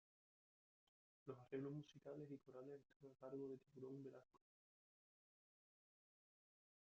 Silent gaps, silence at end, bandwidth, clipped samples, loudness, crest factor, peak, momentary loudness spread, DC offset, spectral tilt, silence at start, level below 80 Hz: 2.96-3.00 s; 2.55 s; 7 kHz; under 0.1%; -57 LUFS; 22 dB; -38 dBFS; 10 LU; under 0.1%; -8 dB/octave; 1.25 s; under -90 dBFS